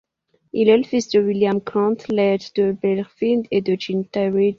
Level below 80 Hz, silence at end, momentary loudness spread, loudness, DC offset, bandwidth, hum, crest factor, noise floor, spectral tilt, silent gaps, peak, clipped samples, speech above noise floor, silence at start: -62 dBFS; 0.05 s; 6 LU; -20 LUFS; under 0.1%; 7.4 kHz; none; 16 dB; -55 dBFS; -6.5 dB/octave; none; -2 dBFS; under 0.1%; 37 dB; 0.55 s